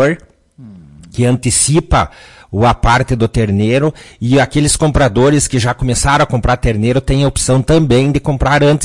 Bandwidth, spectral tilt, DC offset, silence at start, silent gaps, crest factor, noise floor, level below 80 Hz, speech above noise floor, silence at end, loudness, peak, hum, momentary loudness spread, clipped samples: 11.5 kHz; -5 dB/octave; 0.3%; 0 s; none; 12 dB; -38 dBFS; -26 dBFS; 26 dB; 0 s; -12 LUFS; 0 dBFS; none; 4 LU; under 0.1%